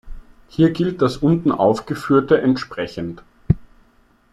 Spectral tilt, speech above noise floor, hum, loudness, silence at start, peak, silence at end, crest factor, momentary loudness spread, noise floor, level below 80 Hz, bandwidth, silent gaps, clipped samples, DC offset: -8 dB/octave; 38 dB; none; -19 LUFS; 0.05 s; -2 dBFS; 0.7 s; 18 dB; 13 LU; -56 dBFS; -40 dBFS; 12.5 kHz; none; under 0.1%; under 0.1%